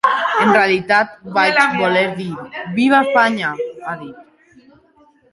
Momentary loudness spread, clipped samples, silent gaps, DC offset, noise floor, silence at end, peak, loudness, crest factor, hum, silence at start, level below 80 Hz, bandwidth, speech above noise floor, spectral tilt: 15 LU; under 0.1%; none; under 0.1%; -53 dBFS; 1.1 s; -2 dBFS; -15 LUFS; 16 dB; none; 0.05 s; -62 dBFS; 11.5 kHz; 37 dB; -5 dB/octave